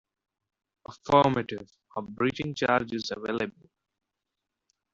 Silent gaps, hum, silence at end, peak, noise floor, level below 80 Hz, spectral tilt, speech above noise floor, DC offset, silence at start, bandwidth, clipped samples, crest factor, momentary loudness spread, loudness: none; none; 1.45 s; -8 dBFS; -85 dBFS; -62 dBFS; -4 dB/octave; 58 dB; under 0.1%; 0.9 s; 7.8 kHz; under 0.1%; 22 dB; 17 LU; -27 LUFS